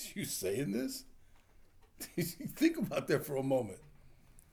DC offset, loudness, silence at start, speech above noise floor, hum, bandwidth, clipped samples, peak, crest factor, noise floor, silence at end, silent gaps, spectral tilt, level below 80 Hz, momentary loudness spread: under 0.1%; -36 LUFS; 0 s; 26 dB; none; over 20 kHz; under 0.1%; -16 dBFS; 20 dB; -61 dBFS; 0.1 s; none; -5 dB/octave; -64 dBFS; 13 LU